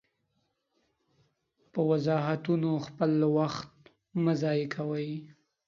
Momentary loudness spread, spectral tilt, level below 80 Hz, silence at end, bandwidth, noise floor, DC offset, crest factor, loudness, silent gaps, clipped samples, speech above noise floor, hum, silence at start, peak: 12 LU; -8 dB/octave; -72 dBFS; 0.35 s; 7.4 kHz; -77 dBFS; under 0.1%; 18 dB; -30 LUFS; none; under 0.1%; 49 dB; none; 1.75 s; -12 dBFS